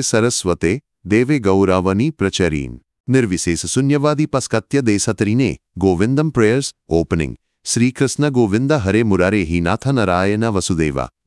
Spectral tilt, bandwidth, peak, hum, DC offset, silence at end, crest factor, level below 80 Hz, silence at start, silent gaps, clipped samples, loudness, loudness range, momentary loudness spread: -5.5 dB/octave; 12 kHz; 0 dBFS; none; under 0.1%; 0.2 s; 16 dB; -42 dBFS; 0 s; 3.00-3.04 s; under 0.1%; -17 LUFS; 1 LU; 5 LU